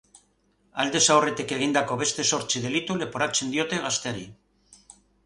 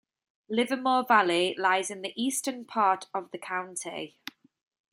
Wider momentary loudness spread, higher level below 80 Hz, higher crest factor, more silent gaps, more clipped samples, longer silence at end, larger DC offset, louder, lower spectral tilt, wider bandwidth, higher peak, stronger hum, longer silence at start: second, 11 LU vs 15 LU; first, -62 dBFS vs -80 dBFS; about the same, 22 dB vs 20 dB; neither; neither; second, 0.5 s vs 0.85 s; neither; first, -24 LUFS vs -28 LUFS; about the same, -2.5 dB/octave vs -2.5 dB/octave; second, 11.5 kHz vs 16 kHz; first, -4 dBFS vs -8 dBFS; first, 50 Hz at -60 dBFS vs none; first, 0.75 s vs 0.5 s